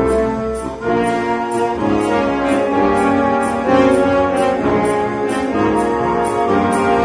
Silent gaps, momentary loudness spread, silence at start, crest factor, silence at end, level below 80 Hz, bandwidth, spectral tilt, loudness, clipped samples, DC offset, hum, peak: none; 5 LU; 0 s; 14 dB; 0 s; -38 dBFS; 10.5 kHz; -6 dB/octave; -16 LUFS; under 0.1%; under 0.1%; none; 0 dBFS